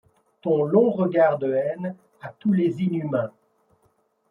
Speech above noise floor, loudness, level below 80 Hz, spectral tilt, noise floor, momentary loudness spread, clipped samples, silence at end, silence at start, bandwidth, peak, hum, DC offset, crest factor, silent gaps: 44 dB; -23 LUFS; -70 dBFS; -10 dB/octave; -66 dBFS; 14 LU; under 0.1%; 1 s; 0.45 s; 4.2 kHz; -6 dBFS; none; under 0.1%; 18 dB; none